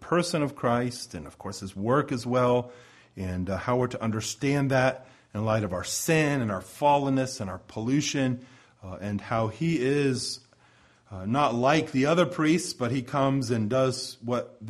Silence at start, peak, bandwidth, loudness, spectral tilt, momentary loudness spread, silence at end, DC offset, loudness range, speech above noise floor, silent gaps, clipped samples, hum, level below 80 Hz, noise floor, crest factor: 0 s; -8 dBFS; 14 kHz; -27 LUFS; -5.5 dB/octave; 14 LU; 0 s; under 0.1%; 3 LU; 33 dB; none; under 0.1%; none; -58 dBFS; -60 dBFS; 18 dB